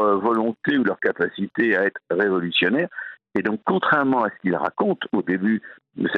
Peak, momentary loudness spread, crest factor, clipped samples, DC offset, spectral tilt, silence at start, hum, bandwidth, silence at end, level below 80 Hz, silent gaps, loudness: -6 dBFS; 7 LU; 16 dB; under 0.1%; under 0.1%; -8 dB/octave; 0 s; none; 5.6 kHz; 0 s; -66 dBFS; none; -22 LUFS